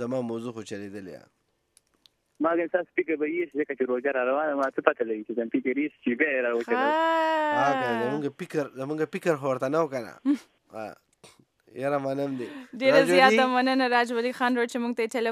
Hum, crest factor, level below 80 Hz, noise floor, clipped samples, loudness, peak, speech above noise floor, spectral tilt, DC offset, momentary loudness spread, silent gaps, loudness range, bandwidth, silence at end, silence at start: none; 24 dB; -80 dBFS; -67 dBFS; under 0.1%; -26 LUFS; -4 dBFS; 41 dB; -5 dB/octave; under 0.1%; 14 LU; none; 8 LU; 14.5 kHz; 0 s; 0 s